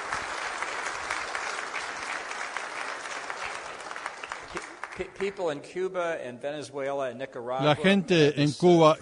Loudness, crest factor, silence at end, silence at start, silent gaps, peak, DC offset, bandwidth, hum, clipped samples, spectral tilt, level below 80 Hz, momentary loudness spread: -29 LUFS; 22 dB; 0 s; 0 s; none; -6 dBFS; under 0.1%; 11 kHz; none; under 0.1%; -5 dB/octave; -64 dBFS; 15 LU